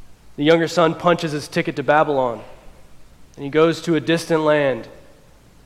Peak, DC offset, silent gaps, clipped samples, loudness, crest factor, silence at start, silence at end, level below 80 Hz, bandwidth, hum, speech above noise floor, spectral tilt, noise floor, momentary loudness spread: -2 dBFS; under 0.1%; none; under 0.1%; -19 LUFS; 18 dB; 0 s; 0.75 s; -52 dBFS; 14 kHz; none; 30 dB; -5.5 dB/octave; -48 dBFS; 7 LU